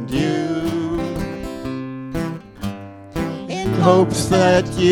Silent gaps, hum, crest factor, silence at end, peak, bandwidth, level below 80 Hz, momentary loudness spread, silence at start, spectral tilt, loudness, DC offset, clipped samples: none; none; 18 dB; 0 s; -2 dBFS; 17.5 kHz; -40 dBFS; 15 LU; 0 s; -6 dB/octave; -20 LUFS; under 0.1%; under 0.1%